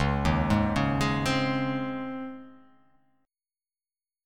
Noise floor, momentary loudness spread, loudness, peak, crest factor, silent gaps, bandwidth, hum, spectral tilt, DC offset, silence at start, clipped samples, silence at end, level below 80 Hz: under -90 dBFS; 13 LU; -27 LUFS; -10 dBFS; 18 dB; none; 15 kHz; none; -6 dB/octave; under 0.1%; 0 s; under 0.1%; 1.7 s; -40 dBFS